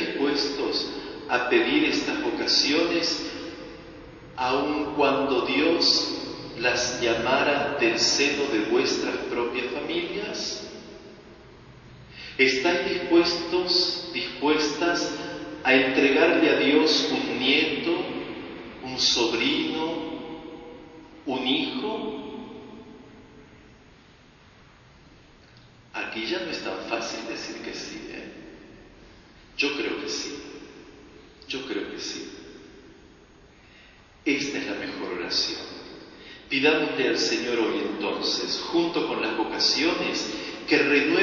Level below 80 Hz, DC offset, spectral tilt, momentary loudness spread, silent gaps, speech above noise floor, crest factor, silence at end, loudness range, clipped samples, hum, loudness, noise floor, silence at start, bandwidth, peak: -58 dBFS; under 0.1%; -3 dB/octave; 20 LU; none; 29 dB; 22 dB; 0 s; 11 LU; under 0.1%; none; -24 LUFS; -53 dBFS; 0 s; 7.4 kHz; -4 dBFS